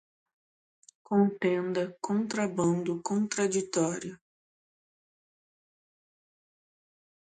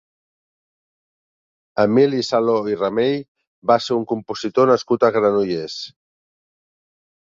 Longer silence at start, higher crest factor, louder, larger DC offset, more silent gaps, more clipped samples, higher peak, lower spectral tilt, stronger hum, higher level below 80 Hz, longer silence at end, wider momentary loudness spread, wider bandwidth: second, 1.1 s vs 1.75 s; about the same, 20 dB vs 18 dB; second, -29 LUFS vs -19 LUFS; neither; second, none vs 3.28-3.35 s, 3.47-3.62 s; neither; second, -12 dBFS vs -2 dBFS; about the same, -5.5 dB/octave vs -6 dB/octave; neither; second, -74 dBFS vs -62 dBFS; first, 3.15 s vs 1.4 s; second, 5 LU vs 11 LU; first, 9.4 kHz vs 7.6 kHz